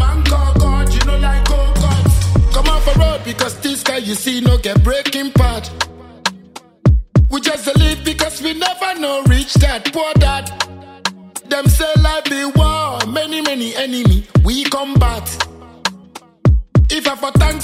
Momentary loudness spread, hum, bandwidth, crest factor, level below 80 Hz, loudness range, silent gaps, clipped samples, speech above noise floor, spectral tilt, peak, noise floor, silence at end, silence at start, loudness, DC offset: 9 LU; none; 16 kHz; 14 dB; -18 dBFS; 2 LU; none; under 0.1%; 24 dB; -5 dB/octave; 0 dBFS; -38 dBFS; 0 s; 0 s; -15 LUFS; under 0.1%